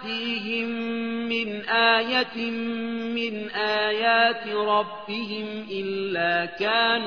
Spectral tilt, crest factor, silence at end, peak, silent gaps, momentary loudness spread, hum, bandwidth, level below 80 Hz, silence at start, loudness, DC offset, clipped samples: -5.5 dB/octave; 18 dB; 0 s; -6 dBFS; none; 10 LU; none; 5.4 kHz; -72 dBFS; 0 s; -24 LUFS; 0.2%; under 0.1%